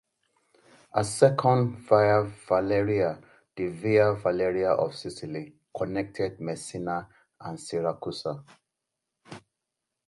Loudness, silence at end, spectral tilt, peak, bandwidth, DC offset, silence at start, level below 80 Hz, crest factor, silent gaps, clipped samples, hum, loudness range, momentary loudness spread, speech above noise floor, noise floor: -27 LUFS; 0.7 s; -6 dB/octave; -6 dBFS; 11.5 kHz; under 0.1%; 0.95 s; -60 dBFS; 22 dB; none; under 0.1%; none; 10 LU; 18 LU; 59 dB; -85 dBFS